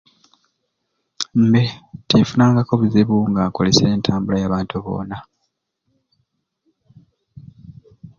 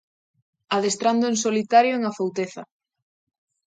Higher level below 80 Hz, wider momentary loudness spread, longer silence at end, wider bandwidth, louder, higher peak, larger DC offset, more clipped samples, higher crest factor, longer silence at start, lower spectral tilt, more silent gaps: first, -46 dBFS vs -74 dBFS; about the same, 12 LU vs 12 LU; second, 0.1 s vs 1.05 s; second, 7.6 kHz vs 9.4 kHz; first, -17 LUFS vs -22 LUFS; first, 0 dBFS vs -6 dBFS; neither; neither; about the same, 20 dB vs 18 dB; first, 1.2 s vs 0.7 s; first, -6 dB/octave vs -3.5 dB/octave; neither